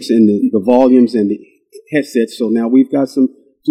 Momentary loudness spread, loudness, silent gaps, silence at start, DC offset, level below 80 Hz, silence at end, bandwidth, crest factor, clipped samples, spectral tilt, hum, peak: 9 LU; -13 LUFS; none; 0 s; under 0.1%; -60 dBFS; 0 s; 12 kHz; 12 dB; 0.1%; -7 dB/octave; none; 0 dBFS